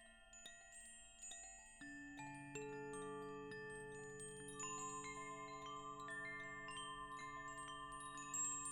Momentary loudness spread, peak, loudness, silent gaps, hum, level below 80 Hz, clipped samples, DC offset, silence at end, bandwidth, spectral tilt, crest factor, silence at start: 10 LU; -34 dBFS; -51 LUFS; none; none; -72 dBFS; under 0.1%; under 0.1%; 0 s; 16.5 kHz; -2 dB/octave; 18 dB; 0 s